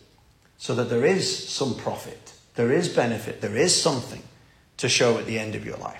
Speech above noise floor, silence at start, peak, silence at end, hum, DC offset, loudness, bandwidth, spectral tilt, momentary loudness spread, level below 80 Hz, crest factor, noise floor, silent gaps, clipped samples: 34 dB; 0.6 s; -6 dBFS; 0 s; none; under 0.1%; -24 LUFS; 16 kHz; -3.5 dB/octave; 16 LU; -60 dBFS; 18 dB; -58 dBFS; none; under 0.1%